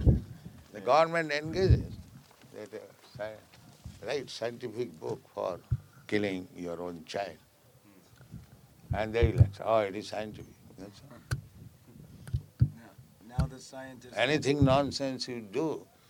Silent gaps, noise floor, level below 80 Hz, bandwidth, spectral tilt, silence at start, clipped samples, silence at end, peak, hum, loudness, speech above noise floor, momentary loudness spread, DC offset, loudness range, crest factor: none; -60 dBFS; -42 dBFS; 16.5 kHz; -6.5 dB/octave; 0 s; under 0.1%; 0.25 s; -8 dBFS; none; -31 LUFS; 30 dB; 24 LU; under 0.1%; 8 LU; 24 dB